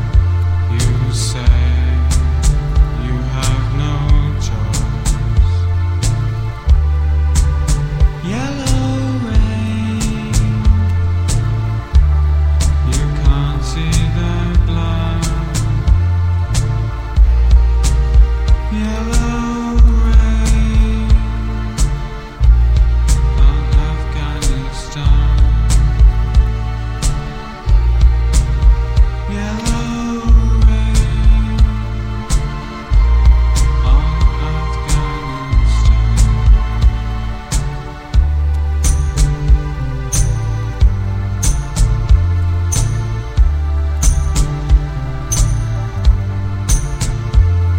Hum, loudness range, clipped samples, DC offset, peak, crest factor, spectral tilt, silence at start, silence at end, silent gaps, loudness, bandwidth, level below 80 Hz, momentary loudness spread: none; 2 LU; under 0.1%; under 0.1%; 0 dBFS; 12 dB; -5.5 dB/octave; 0 s; 0 s; none; -16 LUFS; 11 kHz; -14 dBFS; 7 LU